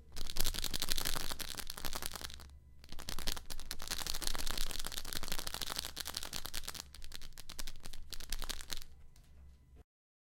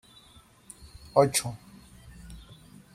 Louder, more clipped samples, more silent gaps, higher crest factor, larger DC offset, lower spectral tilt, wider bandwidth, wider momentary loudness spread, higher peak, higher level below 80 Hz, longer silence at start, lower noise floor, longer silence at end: second, -41 LUFS vs -26 LUFS; neither; neither; about the same, 28 dB vs 26 dB; neither; second, -1.5 dB/octave vs -4 dB/octave; first, 17 kHz vs 15 kHz; second, 16 LU vs 27 LU; second, -10 dBFS vs -6 dBFS; first, -42 dBFS vs -54 dBFS; second, 0 s vs 0.8 s; about the same, -58 dBFS vs -56 dBFS; about the same, 0.6 s vs 0.55 s